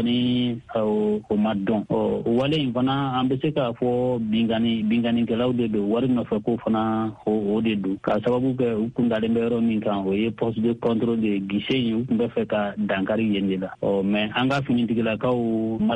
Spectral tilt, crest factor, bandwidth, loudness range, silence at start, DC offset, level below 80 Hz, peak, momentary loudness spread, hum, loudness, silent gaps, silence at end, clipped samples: -8 dB/octave; 14 dB; 8.2 kHz; 1 LU; 0 s; under 0.1%; -54 dBFS; -8 dBFS; 3 LU; none; -23 LUFS; none; 0 s; under 0.1%